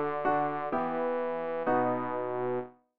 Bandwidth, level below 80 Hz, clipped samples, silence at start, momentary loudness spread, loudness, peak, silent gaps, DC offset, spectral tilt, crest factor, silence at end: 4.9 kHz; -66 dBFS; under 0.1%; 0 s; 5 LU; -31 LUFS; -16 dBFS; none; 0.4%; -5.5 dB/octave; 14 dB; 0 s